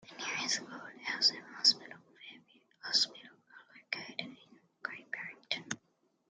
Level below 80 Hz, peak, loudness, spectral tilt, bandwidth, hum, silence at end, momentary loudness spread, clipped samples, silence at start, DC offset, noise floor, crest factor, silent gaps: -88 dBFS; -10 dBFS; -33 LUFS; 0 dB/octave; 11.5 kHz; none; 0.55 s; 24 LU; under 0.1%; 0.05 s; under 0.1%; -76 dBFS; 28 dB; none